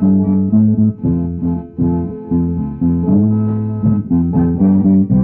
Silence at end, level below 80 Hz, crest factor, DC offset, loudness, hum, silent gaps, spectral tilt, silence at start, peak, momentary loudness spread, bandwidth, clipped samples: 0 s; -34 dBFS; 10 dB; under 0.1%; -15 LUFS; none; none; -15.5 dB/octave; 0 s; -2 dBFS; 7 LU; 2 kHz; under 0.1%